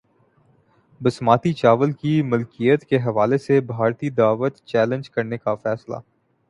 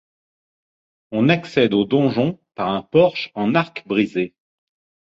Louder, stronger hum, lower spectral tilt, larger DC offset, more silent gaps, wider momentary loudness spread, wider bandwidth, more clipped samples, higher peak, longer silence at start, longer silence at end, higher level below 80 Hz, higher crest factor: about the same, -20 LUFS vs -19 LUFS; neither; about the same, -8 dB/octave vs -7.5 dB/octave; neither; neither; about the same, 8 LU vs 8 LU; first, 11 kHz vs 7.8 kHz; neither; about the same, -2 dBFS vs -2 dBFS; about the same, 1 s vs 1.1 s; second, 0.5 s vs 0.8 s; about the same, -60 dBFS vs -58 dBFS; about the same, 20 dB vs 18 dB